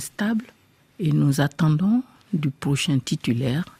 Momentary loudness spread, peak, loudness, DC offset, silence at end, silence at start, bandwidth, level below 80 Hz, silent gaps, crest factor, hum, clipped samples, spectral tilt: 6 LU; -10 dBFS; -23 LUFS; under 0.1%; 0.15 s; 0 s; 15.5 kHz; -56 dBFS; none; 14 dB; none; under 0.1%; -6 dB/octave